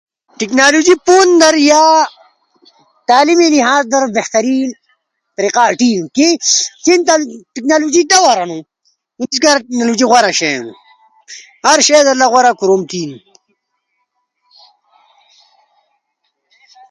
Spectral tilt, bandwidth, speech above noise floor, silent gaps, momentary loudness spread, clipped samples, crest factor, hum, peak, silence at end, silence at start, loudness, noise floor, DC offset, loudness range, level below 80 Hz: -2 dB/octave; 11.5 kHz; 58 dB; none; 14 LU; under 0.1%; 12 dB; none; 0 dBFS; 3.75 s; 0.4 s; -11 LUFS; -68 dBFS; under 0.1%; 4 LU; -62 dBFS